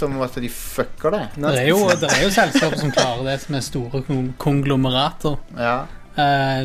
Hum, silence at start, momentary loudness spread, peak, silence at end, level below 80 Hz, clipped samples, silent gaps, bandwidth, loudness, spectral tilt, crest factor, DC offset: none; 0 s; 10 LU; 0 dBFS; 0 s; -38 dBFS; under 0.1%; none; 15.5 kHz; -20 LUFS; -4.5 dB/octave; 20 dB; under 0.1%